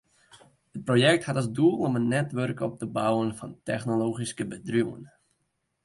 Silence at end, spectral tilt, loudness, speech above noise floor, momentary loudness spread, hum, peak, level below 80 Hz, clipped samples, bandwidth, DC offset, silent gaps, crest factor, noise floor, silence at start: 0.8 s; -6 dB/octave; -27 LUFS; 50 dB; 12 LU; none; -8 dBFS; -64 dBFS; under 0.1%; 11.5 kHz; under 0.1%; none; 20 dB; -77 dBFS; 0.35 s